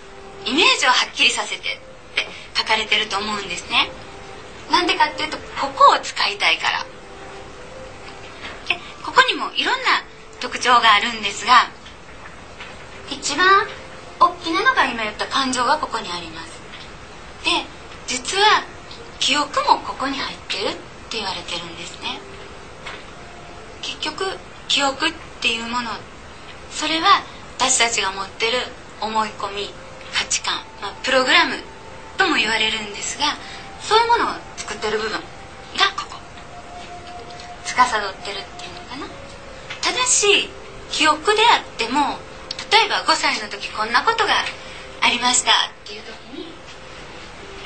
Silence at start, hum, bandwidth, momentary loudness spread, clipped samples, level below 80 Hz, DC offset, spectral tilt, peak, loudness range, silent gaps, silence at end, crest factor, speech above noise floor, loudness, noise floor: 0 s; none; 9.2 kHz; 22 LU; under 0.1%; -48 dBFS; 0.6%; -1 dB/octave; 0 dBFS; 7 LU; none; 0 s; 22 dB; 20 dB; -19 LUFS; -40 dBFS